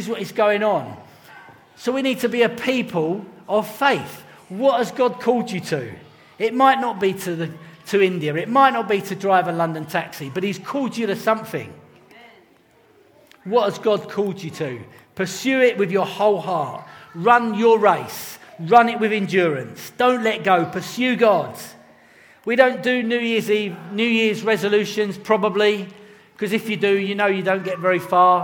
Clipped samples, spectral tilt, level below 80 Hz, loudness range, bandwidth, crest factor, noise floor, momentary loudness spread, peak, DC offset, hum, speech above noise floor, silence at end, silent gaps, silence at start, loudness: under 0.1%; -5 dB/octave; -68 dBFS; 7 LU; over 20 kHz; 20 dB; -55 dBFS; 14 LU; 0 dBFS; under 0.1%; none; 35 dB; 0 s; none; 0 s; -20 LUFS